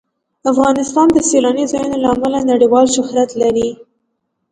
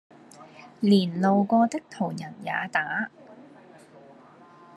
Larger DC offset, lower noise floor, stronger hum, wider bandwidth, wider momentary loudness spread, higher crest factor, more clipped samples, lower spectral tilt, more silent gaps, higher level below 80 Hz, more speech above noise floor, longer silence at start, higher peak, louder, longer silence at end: neither; first, -70 dBFS vs -51 dBFS; neither; about the same, 10.5 kHz vs 11.5 kHz; second, 6 LU vs 12 LU; second, 14 dB vs 20 dB; neither; second, -4 dB/octave vs -6.5 dB/octave; neither; first, -48 dBFS vs -74 dBFS; first, 57 dB vs 27 dB; about the same, 0.45 s vs 0.4 s; first, 0 dBFS vs -8 dBFS; first, -14 LUFS vs -25 LUFS; second, 0.8 s vs 1.35 s